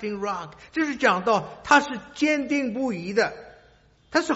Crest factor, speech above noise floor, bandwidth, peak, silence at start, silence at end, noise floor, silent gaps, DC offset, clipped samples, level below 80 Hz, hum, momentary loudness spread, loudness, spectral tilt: 20 dB; 33 dB; 8 kHz; -4 dBFS; 0 s; 0 s; -57 dBFS; none; under 0.1%; under 0.1%; -60 dBFS; none; 12 LU; -24 LUFS; -2.5 dB/octave